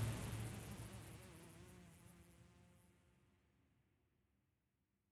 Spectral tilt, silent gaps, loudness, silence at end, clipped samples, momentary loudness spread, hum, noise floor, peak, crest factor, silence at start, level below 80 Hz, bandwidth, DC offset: -5 dB/octave; none; -53 LUFS; 1.8 s; under 0.1%; 19 LU; none; -87 dBFS; -32 dBFS; 22 dB; 0 s; -64 dBFS; 14.5 kHz; under 0.1%